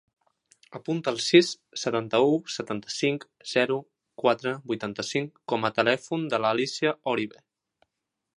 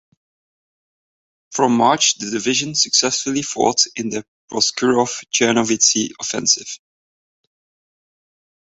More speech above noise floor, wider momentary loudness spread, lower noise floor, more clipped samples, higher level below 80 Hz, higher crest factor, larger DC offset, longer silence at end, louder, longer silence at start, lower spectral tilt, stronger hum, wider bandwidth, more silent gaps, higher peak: second, 55 dB vs over 72 dB; about the same, 11 LU vs 12 LU; second, -81 dBFS vs under -90 dBFS; neither; second, -72 dBFS vs -62 dBFS; about the same, 22 dB vs 20 dB; neither; second, 1.05 s vs 1.95 s; second, -26 LUFS vs -17 LUFS; second, 0.7 s vs 1.5 s; first, -4.5 dB/octave vs -2 dB/octave; neither; first, 11.5 kHz vs 8.2 kHz; second, none vs 4.28-4.48 s; second, -6 dBFS vs 0 dBFS